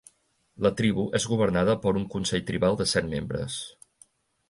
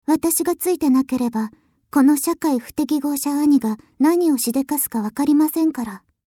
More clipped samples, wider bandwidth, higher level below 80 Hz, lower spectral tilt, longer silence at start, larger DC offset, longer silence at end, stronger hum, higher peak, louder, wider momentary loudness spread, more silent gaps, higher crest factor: neither; second, 11.5 kHz vs 18.5 kHz; first, -50 dBFS vs -58 dBFS; about the same, -5 dB/octave vs -4 dB/octave; first, 0.6 s vs 0.1 s; neither; first, 0.8 s vs 0.3 s; neither; second, -10 dBFS vs -6 dBFS; second, -26 LUFS vs -19 LUFS; about the same, 8 LU vs 7 LU; neither; about the same, 18 dB vs 14 dB